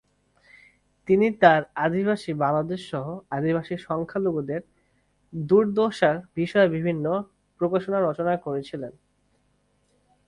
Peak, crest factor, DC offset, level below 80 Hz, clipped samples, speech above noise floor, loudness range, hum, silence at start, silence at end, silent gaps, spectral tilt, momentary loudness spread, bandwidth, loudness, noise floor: -2 dBFS; 22 dB; under 0.1%; -62 dBFS; under 0.1%; 44 dB; 5 LU; 50 Hz at -50 dBFS; 1.05 s; 1.35 s; none; -7.5 dB/octave; 13 LU; 11 kHz; -24 LUFS; -67 dBFS